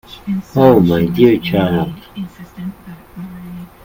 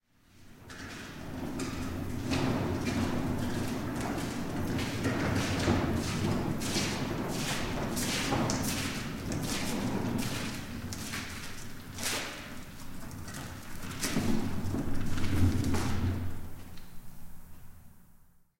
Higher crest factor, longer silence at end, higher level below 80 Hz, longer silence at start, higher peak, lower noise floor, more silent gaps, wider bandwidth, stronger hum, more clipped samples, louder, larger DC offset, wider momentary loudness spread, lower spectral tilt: about the same, 16 dB vs 18 dB; second, 0.2 s vs 0.35 s; about the same, -42 dBFS vs -44 dBFS; second, 0.1 s vs 0.35 s; first, 0 dBFS vs -14 dBFS; second, -34 dBFS vs -58 dBFS; neither; about the same, 17 kHz vs 16.5 kHz; neither; neither; first, -13 LUFS vs -33 LUFS; neither; first, 21 LU vs 15 LU; first, -8.5 dB/octave vs -4.5 dB/octave